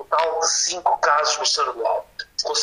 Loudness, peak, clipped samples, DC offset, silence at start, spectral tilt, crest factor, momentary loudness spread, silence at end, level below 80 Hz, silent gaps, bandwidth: -20 LUFS; -6 dBFS; under 0.1%; under 0.1%; 0 s; 1.5 dB/octave; 16 dB; 8 LU; 0 s; -60 dBFS; none; 12.5 kHz